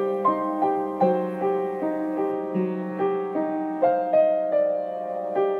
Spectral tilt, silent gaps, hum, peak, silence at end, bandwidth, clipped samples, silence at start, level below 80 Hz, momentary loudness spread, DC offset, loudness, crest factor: -9.5 dB/octave; none; none; -8 dBFS; 0 s; 4.6 kHz; under 0.1%; 0 s; -76 dBFS; 7 LU; under 0.1%; -24 LUFS; 16 dB